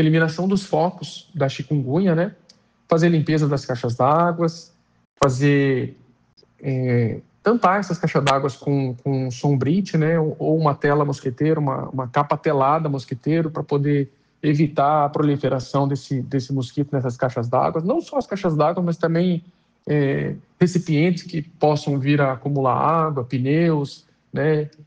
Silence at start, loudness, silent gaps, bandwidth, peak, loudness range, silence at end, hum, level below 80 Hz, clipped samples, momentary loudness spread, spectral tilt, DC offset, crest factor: 0 s; -21 LUFS; 5.05-5.16 s, 6.33-6.37 s; 9 kHz; -2 dBFS; 2 LU; 0.2 s; none; -58 dBFS; under 0.1%; 7 LU; -7.5 dB/octave; under 0.1%; 18 dB